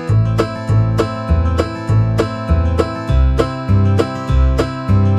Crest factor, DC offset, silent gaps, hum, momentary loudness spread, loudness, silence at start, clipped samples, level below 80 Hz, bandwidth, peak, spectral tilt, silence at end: 14 dB; under 0.1%; none; none; 4 LU; -16 LUFS; 0 s; under 0.1%; -20 dBFS; 10.5 kHz; 0 dBFS; -8 dB/octave; 0 s